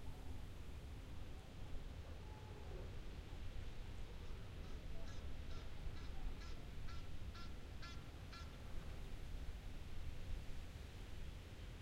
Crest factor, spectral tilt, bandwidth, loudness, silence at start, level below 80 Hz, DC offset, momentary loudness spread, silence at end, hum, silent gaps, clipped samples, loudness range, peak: 14 dB; -5.5 dB/octave; 15.5 kHz; -54 LUFS; 0 s; -52 dBFS; under 0.1%; 2 LU; 0 s; none; none; under 0.1%; 1 LU; -34 dBFS